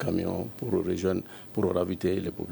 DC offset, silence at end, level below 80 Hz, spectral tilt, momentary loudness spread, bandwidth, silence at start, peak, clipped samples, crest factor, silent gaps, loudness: under 0.1%; 0 s; -56 dBFS; -7.5 dB/octave; 6 LU; over 20 kHz; 0 s; -12 dBFS; under 0.1%; 16 dB; none; -30 LUFS